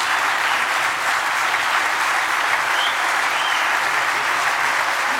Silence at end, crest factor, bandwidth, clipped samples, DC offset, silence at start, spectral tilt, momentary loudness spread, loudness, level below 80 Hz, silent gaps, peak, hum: 0 s; 14 dB; 16.5 kHz; under 0.1%; under 0.1%; 0 s; 0.5 dB/octave; 1 LU; -18 LUFS; -64 dBFS; none; -4 dBFS; none